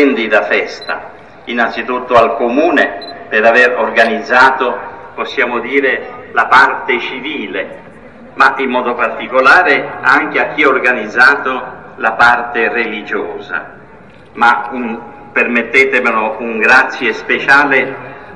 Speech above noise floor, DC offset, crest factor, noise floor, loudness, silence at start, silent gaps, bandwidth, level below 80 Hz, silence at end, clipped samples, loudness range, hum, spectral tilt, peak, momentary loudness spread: 26 dB; 0.5%; 12 dB; -38 dBFS; -11 LUFS; 0 s; none; 11.5 kHz; -52 dBFS; 0 s; 0.3%; 4 LU; none; -4 dB/octave; 0 dBFS; 14 LU